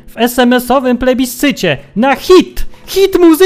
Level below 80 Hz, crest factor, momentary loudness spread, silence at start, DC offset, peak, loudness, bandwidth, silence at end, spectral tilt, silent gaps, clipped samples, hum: -28 dBFS; 10 dB; 7 LU; 0.05 s; under 0.1%; 0 dBFS; -10 LUFS; 16 kHz; 0 s; -4.5 dB/octave; none; 1%; none